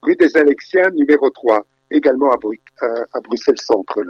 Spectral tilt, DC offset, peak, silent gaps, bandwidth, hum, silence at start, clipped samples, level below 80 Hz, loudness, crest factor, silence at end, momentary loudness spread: -4.5 dB/octave; under 0.1%; -2 dBFS; none; 7.2 kHz; none; 0.05 s; under 0.1%; -60 dBFS; -16 LUFS; 14 dB; 0 s; 10 LU